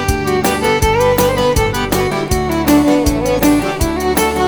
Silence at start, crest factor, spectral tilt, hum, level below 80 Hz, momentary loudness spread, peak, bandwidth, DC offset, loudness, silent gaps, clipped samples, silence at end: 0 s; 12 dB; -5 dB/octave; none; -26 dBFS; 4 LU; 0 dBFS; over 20 kHz; 0.6%; -14 LUFS; none; under 0.1%; 0 s